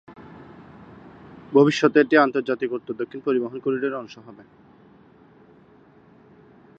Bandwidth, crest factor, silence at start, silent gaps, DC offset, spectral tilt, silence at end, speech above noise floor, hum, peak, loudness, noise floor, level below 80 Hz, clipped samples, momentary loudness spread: 8 kHz; 22 dB; 0.1 s; none; under 0.1%; -6 dB/octave; 2.45 s; 31 dB; none; -2 dBFS; -21 LUFS; -53 dBFS; -66 dBFS; under 0.1%; 26 LU